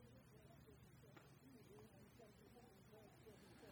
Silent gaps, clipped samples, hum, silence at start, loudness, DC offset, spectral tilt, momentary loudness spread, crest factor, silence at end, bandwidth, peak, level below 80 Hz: none; under 0.1%; none; 0 s; -66 LUFS; under 0.1%; -5.5 dB/octave; 2 LU; 16 dB; 0 s; 19.5 kHz; -50 dBFS; -78 dBFS